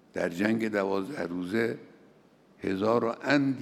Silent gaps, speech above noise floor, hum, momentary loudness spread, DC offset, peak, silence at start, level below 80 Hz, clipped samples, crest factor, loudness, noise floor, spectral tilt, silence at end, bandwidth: none; 31 dB; none; 8 LU; under 0.1%; -10 dBFS; 0.15 s; -74 dBFS; under 0.1%; 20 dB; -29 LUFS; -59 dBFS; -6.5 dB/octave; 0 s; 14 kHz